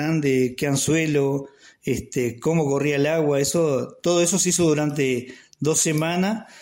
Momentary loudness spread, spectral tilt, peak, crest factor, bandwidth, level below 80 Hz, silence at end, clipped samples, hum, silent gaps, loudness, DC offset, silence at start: 9 LU; -4.5 dB/octave; -8 dBFS; 14 dB; 16.5 kHz; -54 dBFS; 0 s; under 0.1%; none; none; -21 LUFS; under 0.1%; 0 s